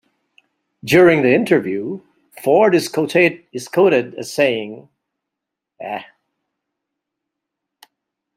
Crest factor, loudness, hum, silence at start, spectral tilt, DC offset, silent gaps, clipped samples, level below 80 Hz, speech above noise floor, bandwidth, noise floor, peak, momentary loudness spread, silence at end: 18 dB; -16 LUFS; none; 0.85 s; -5.5 dB/octave; under 0.1%; none; under 0.1%; -60 dBFS; 67 dB; 16 kHz; -82 dBFS; -2 dBFS; 18 LU; 2.35 s